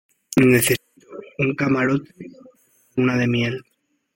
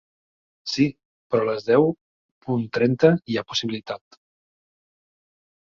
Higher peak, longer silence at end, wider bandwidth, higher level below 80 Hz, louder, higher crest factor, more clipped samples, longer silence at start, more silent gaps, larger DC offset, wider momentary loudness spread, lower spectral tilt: about the same, -4 dBFS vs -2 dBFS; second, 0.55 s vs 1.7 s; first, 16.5 kHz vs 7.4 kHz; first, -56 dBFS vs -62 dBFS; about the same, -20 LUFS vs -22 LUFS; about the same, 18 dB vs 22 dB; neither; second, 0.3 s vs 0.65 s; second, none vs 1.05-1.30 s, 2.01-2.41 s; neither; first, 25 LU vs 17 LU; about the same, -5 dB/octave vs -6 dB/octave